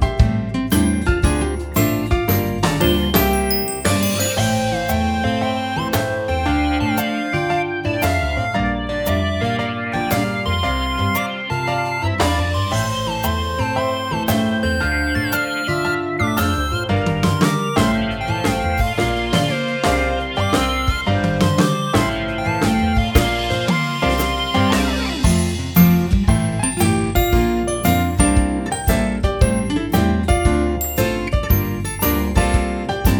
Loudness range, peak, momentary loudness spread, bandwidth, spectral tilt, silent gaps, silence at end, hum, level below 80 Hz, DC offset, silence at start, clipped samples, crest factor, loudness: 3 LU; 0 dBFS; 4 LU; over 20 kHz; -5 dB/octave; none; 0 s; none; -26 dBFS; under 0.1%; 0 s; under 0.1%; 18 dB; -19 LUFS